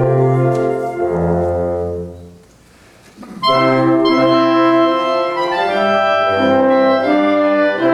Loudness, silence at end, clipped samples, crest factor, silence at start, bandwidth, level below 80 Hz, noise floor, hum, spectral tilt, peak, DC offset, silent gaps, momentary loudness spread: -14 LUFS; 0 s; under 0.1%; 14 dB; 0 s; 11 kHz; -50 dBFS; -45 dBFS; none; -7 dB/octave; -2 dBFS; under 0.1%; none; 7 LU